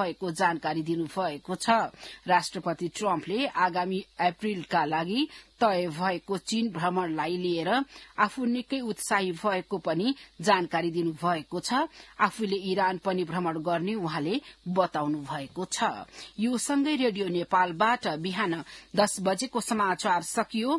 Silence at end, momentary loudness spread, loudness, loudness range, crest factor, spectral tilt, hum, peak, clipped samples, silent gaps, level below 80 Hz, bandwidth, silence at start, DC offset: 0 s; 7 LU; -28 LUFS; 2 LU; 22 dB; -4.5 dB/octave; none; -8 dBFS; under 0.1%; none; -66 dBFS; 12 kHz; 0 s; under 0.1%